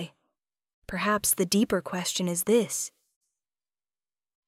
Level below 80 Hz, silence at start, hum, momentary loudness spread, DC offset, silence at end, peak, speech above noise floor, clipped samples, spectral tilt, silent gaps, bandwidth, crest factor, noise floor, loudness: -60 dBFS; 0 s; none; 11 LU; under 0.1%; 1.6 s; -10 dBFS; over 64 dB; under 0.1%; -3.5 dB/octave; 0.74-0.82 s; 16 kHz; 20 dB; under -90 dBFS; -26 LUFS